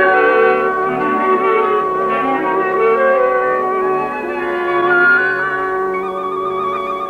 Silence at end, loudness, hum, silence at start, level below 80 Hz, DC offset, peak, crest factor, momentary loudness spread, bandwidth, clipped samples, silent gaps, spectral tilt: 0 s; -15 LUFS; none; 0 s; -52 dBFS; under 0.1%; -2 dBFS; 14 dB; 8 LU; 8.2 kHz; under 0.1%; none; -6.5 dB/octave